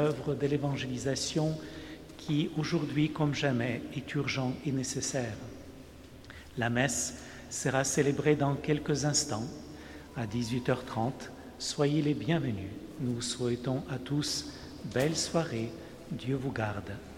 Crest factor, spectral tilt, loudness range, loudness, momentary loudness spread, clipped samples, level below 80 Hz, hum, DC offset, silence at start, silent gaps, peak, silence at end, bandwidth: 20 dB; -4.5 dB/octave; 3 LU; -32 LUFS; 16 LU; under 0.1%; -56 dBFS; none; under 0.1%; 0 s; none; -12 dBFS; 0 s; 16 kHz